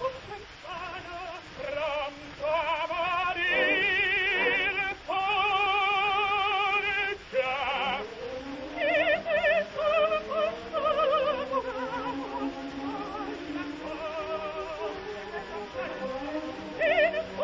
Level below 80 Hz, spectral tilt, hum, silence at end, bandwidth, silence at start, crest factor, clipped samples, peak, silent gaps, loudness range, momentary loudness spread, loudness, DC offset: -56 dBFS; -4 dB/octave; none; 0 s; 7.6 kHz; 0 s; 16 dB; under 0.1%; -12 dBFS; none; 10 LU; 13 LU; -28 LUFS; under 0.1%